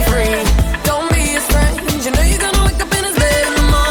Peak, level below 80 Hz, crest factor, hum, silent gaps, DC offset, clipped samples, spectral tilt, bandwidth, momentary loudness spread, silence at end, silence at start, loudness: -2 dBFS; -16 dBFS; 10 dB; none; none; under 0.1%; under 0.1%; -4 dB/octave; 19.5 kHz; 3 LU; 0 s; 0 s; -14 LUFS